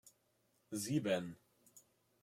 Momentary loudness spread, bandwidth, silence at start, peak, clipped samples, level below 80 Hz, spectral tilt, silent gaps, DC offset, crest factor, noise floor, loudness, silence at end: 16 LU; 16.5 kHz; 0.05 s; -24 dBFS; under 0.1%; -80 dBFS; -5 dB/octave; none; under 0.1%; 20 dB; -78 dBFS; -40 LUFS; 0.45 s